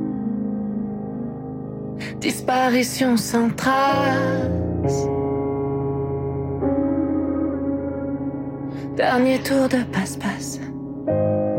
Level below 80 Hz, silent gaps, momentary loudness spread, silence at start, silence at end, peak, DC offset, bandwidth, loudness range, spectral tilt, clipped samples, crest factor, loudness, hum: -46 dBFS; none; 11 LU; 0 s; 0 s; -8 dBFS; under 0.1%; 16.5 kHz; 4 LU; -5.5 dB/octave; under 0.1%; 14 dB; -22 LUFS; none